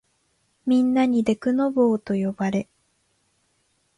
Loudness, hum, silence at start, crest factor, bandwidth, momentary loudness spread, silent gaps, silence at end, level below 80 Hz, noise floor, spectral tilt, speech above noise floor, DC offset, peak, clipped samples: -22 LUFS; none; 0.65 s; 16 dB; 10.5 kHz; 8 LU; none; 1.35 s; -62 dBFS; -68 dBFS; -7.5 dB/octave; 47 dB; under 0.1%; -8 dBFS; under 0.1%